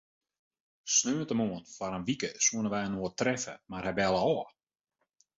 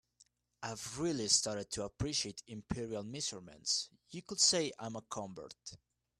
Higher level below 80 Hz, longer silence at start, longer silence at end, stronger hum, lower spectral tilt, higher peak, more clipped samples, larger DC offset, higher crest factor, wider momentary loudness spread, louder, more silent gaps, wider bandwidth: about the same, -62 dBFS vs -62 dBFS; first, 0.85 s vs 0.2 s; first, 0.9 s vs 0.45 s; neither; about the same, -3 dB/octave vs -2.5 dB/octave; about the same, -14 dBFS vs -14 dBFS; neither; neither; about the same, 20 dB vs 24 dB; second, 11 LU vs 19 LU; first, -31 LUFS vs -36 LUFS; neither; second, 8 kHz vs 13.5 kHz